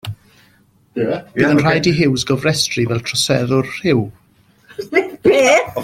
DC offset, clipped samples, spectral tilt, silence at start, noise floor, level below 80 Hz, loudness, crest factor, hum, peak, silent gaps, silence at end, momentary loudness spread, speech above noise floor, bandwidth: under 0.1%; under 0.1%; -4.5 dB/octave; 0.05 s; -54 dBFS; -48 dBFS; -15 LUFS; 16 dB; none; -2 dBFS; none; 0 s; 17 LU; 39 dB; 16.5 kHz